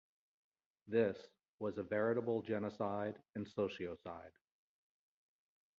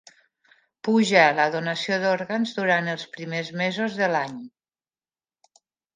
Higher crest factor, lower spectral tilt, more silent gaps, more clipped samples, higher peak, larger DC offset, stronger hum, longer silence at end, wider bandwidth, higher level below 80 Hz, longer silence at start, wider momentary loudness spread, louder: about the same, 20 dB vs 22 dB; about the same, -6 dB/octave vs -5 dB/octave; first, 1.50-1.58 s vs none; neither; second, -22 dBFS vs -2 dBFS; neither; neither; about the same, 1.5 s vs 1.45 s; second, 7 kHz vs 9.6 kHz; about the same, -74 dBFS vs -76 dBFS; about the same, 0.85 s vs 0.85 s; about the same, 13 LU vs 14 LU; second, -40 LUFS vs -23 LUFS